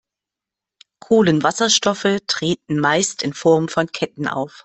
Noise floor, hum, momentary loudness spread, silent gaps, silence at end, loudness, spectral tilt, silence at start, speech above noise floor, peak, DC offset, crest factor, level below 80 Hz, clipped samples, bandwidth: -86 dBFS; none; 8 LU; none; 0 s; -18 LUFS; -3.5 dB/octave; 1.1 s; 68 dB; -2 dBFS; under 0.1%; 16 dB; -58 dBFS; under 0.1%; 8.6 kHz